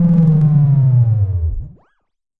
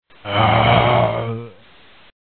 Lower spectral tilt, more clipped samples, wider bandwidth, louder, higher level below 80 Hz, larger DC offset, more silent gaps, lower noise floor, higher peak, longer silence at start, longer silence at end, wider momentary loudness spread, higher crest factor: first, -13 dB/octave vs -10 dB/octave; neither; second, 2.1 kHz vs 4.5 kHz; first, -13 LUFS vs -16 LUFS; first, -30 dBFS vs -38 dBFS; second, under 0.1% vs 0.3%; neither; first, -68 dBFS vs -49 dBFS; about the same, -2 dBFS vs 0 dBFS; second, 0 s vs 0.25 s; about the same, 0.7 s vs 0.75 s; about the same, 11 LU vs 13 LU; second, 10 dB vs 18 dB